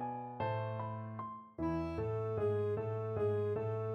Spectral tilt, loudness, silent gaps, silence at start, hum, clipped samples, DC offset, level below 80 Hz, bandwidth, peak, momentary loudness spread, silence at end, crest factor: -9.5 dB/octave; -38 LUFS; none; 0 s; none; under 0.1%; under 0.1%; -60 dBFS; 6 kHz; -26 dBFS; 8 LU; 0 s; 12 dB